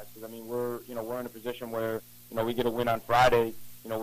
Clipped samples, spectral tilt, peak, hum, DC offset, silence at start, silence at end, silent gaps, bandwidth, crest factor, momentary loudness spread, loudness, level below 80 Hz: under 0.1%; -5 dB/octave; -12 dBFS; none; under 0.1%; 0 s; 0 s; none; 15.5 kHz; 16 dB; 15 LU; -30 LUFS; -54 dBFS